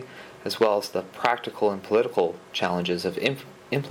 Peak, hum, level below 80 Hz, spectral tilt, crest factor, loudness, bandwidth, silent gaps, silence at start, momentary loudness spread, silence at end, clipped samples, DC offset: 0 dBFS; none; -68 dBFS; -5 dB/octave; 26 dB; -26 LUFS; 17.5 kHz; none; 0 s; 9 LU; 0 s; under 0.1%; under 0.1%